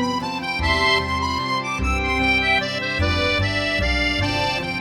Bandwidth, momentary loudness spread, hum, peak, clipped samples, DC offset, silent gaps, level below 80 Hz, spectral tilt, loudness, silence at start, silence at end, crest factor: 15.5 kHz; 5 LU; none; -6 dBFS; under 0.1%; under 0.1%; none; -32 dBFS; -4.5 dB/octave; -20 LUFS; 0 s; 0 s; 16 dB